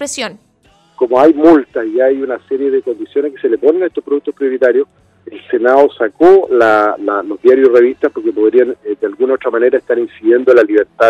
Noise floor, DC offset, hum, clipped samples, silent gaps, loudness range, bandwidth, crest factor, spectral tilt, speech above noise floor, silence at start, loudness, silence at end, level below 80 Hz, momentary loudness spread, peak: -51 dBFS; under 0.1%; none; 0.5%; none; 4 LU; 11 kHz; 12 dB; -4.5 dB/octave; 40 dB; 0 s; -12 LUFS; 0 s; -54 dBFS; 10 LU; 0 dBFS